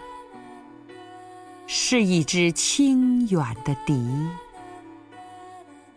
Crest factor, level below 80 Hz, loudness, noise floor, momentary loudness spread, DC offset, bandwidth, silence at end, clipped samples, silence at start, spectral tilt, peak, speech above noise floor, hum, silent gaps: 16 dB; -56 dBFS; -22 LUFS; -46 dBFS; 25 LU; under 0.1%; 11 kHz; 0.35 s; under 0.1%; 0 s; -4.5 dB/octave; -10 dBFS; 24 dB; none; none